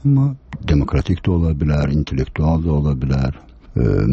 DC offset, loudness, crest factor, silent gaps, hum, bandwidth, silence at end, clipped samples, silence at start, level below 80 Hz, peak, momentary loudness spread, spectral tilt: under 0.1%; -19 LUFS; 12 dB; none; none; 7 kHz; 0 s; under 0.1%; 0.05 s; -26 dBFS; -4 dBFS; 6 LU; -9 dB/octave